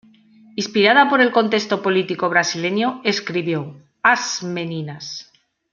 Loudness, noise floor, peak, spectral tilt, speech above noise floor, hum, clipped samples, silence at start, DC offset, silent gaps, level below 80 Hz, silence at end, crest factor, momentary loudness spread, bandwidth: -18 LUFS; -49 dBFS; -2 dBFS; -4 dB/octave; 31 dB; none; under 0.1%; 0.55 s; under 0.1%; none; -68 dBFS; 0.5 s; 18 dB; 16 LU; 7.4 kHz